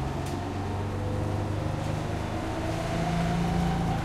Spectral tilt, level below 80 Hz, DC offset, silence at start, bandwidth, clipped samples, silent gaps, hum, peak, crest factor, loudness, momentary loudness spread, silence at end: -6.5 dB/octave; -40 dBFS; under 0.1%; 0 s; 14 kHz; under 0.1%; none; none; -16 dBFS; 12 dB; -30 LUFS; 5 LU; 0 s